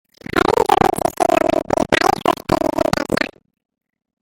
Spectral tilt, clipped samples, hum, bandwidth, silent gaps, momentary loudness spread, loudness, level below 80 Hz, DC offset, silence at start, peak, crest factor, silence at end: -4.5 dB/octave; under 0.1%; none; 17 kHz; none; 6 LU; -17 LUFS; -42 dBFS; under 0.1%; 0.35 s; 0 dBFS; 18 dB; 0.95 s